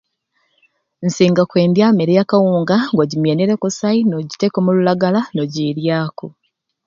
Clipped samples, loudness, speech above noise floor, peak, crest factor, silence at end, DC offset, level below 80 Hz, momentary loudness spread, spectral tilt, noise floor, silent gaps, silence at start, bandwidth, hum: under 0.1%; -16 LUFS; 51 dB; 0 dBFS; 16 dB; 0.55 s; under 0.1%; -60 dBFS; 8 LU; -6.5 dB/octave; -66 dBFS; none; 1 s; 7.6 kHz; none